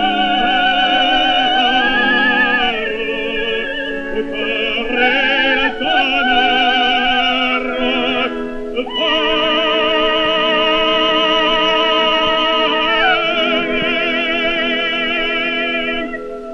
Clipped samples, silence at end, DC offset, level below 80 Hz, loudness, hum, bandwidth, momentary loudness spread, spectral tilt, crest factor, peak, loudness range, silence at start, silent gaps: under 0.1%; 0 s; under 0.1%; -38 dBFS; -14 LUFS; none; 8.4 kHz; 7 LU; -3.5 dB/octave; 14 dB; 0 dBFS; 3 LU; 0 s; none